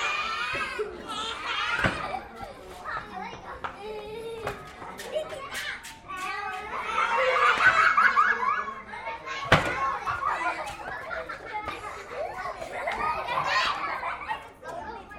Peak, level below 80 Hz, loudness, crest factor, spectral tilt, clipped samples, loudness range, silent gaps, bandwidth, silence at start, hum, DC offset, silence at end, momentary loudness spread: -4 dBFS; -52 dBFS; -27 LUFS; 24 dB; -3.5 dB/octave; under 0.1%; 13 LU; none; 16 kHz; 0 s; none; under 0.1%; 0 s; 17 LU